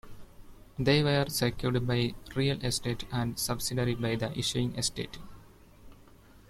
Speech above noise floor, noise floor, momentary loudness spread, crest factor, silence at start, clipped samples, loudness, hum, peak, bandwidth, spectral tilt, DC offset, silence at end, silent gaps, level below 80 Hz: 25 dB; -55 dBFS; 7 LU; 20 dB; 0.05 s; under 0.1%; -30 LUFS; none; -12 dBFS; 16 kHz; -4.5 dB/octave; under 0.1%; 0.1 s; none; -50 dBFS